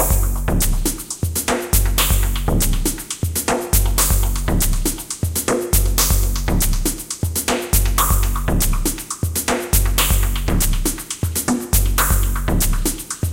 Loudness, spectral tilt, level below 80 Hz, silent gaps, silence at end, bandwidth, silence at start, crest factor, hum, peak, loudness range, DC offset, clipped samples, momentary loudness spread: -19 LUFS; -3.5 dB/octave; -20 dBFS; none; 0 s; 17 kHz; 0 s; 18 dB; none; 0 dBFS; 1 LU; under 0.1%; under 0.1%; 6 LU